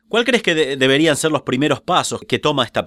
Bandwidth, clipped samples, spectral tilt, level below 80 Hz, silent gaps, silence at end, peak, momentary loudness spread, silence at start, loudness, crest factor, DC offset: 16 kHz; under 0.1%; -4 dB/octave; -56 dBFS; none; 0 s; -2 dBFS; 4 LU; 0.15 s; -17 LUFS; 16 dB; under 0.1%